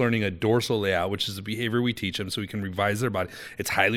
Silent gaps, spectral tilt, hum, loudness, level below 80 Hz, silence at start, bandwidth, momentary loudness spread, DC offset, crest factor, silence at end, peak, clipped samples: none; -5 dB/octave; none; -27 LUFS; -56 dBFS; 0 s; 17 kHz; 7 LU; under 0.1%; 20 dB; 0 s; -6 dBFS; under 0.1%